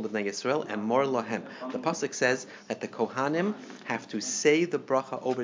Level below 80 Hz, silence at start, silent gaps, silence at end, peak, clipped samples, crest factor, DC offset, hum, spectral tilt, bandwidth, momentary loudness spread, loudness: -82 dBFS; 0 s; none; 0 s; -10 dBFS; under 0.1%; 20 dB; under 0.1%; none; -4 dB/octave; 7.6 kHz; 10 LU; -29 LUFS